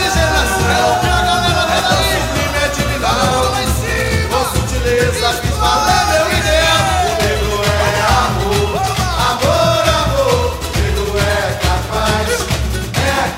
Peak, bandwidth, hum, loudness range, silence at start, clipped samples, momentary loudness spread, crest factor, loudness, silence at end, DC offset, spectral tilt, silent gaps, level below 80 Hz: 0 dBFS; 16.5 kHz; none; 2 LU; 0 s; under 0.1%; 4 LU; 14 dB; -14 LUFS; 0 s; under 0.1%; -4 dB/octave; none; -24 dBFS